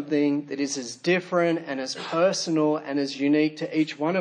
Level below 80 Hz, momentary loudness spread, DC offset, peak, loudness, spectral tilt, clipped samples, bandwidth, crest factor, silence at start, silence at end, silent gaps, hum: -80 dBFS; 6 LU; under 0.1%; -10 dBFS; -25 LUFS; -4.5 dB/octave; under 0.1%; 10 kHz; 16 dB; 0 s; 0 s; none; none